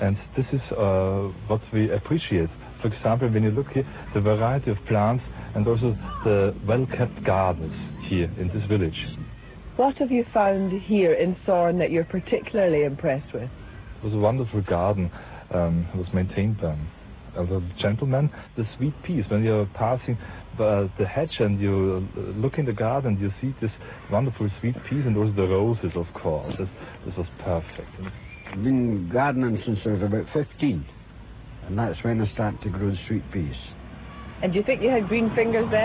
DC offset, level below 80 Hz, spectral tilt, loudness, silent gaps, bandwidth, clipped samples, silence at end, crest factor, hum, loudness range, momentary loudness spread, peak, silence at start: under 0.1%; -42 dBFS; -12 dB/octave; -25 LUFS; none; 4 kHz; under 0.1%; 0 s; 16 dB; none; 4 LU; 12 LU; -8 dBFS; 0 s